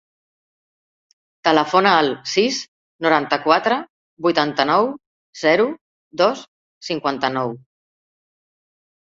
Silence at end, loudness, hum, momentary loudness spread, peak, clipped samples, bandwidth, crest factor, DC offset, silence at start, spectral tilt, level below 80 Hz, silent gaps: 1.5 s; -19 LUFS; none; 17 LU; -2 dBFS; under 0.1%; 7.8 kHz; 20 dB; under 0.1%; 1.45 s; -4 dB/octave; -64 dBFS; 2.68-2.99 s, 3.90-4.17 s, 5.06-5.33 s, 5.81-6.11 s, 6.48-6.81 s